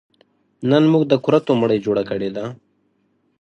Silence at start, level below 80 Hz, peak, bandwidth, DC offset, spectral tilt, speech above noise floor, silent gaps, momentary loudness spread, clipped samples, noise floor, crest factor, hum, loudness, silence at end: 0.6 s; -60 dBFS; -2 dBFS; 7.6 kHz; under 0.1%; -8 dB/octave; 48 dB; none; 12 LU; under 0.1%; -65 dBFS; 18 dB; none; -18 LUFS; 0.85 s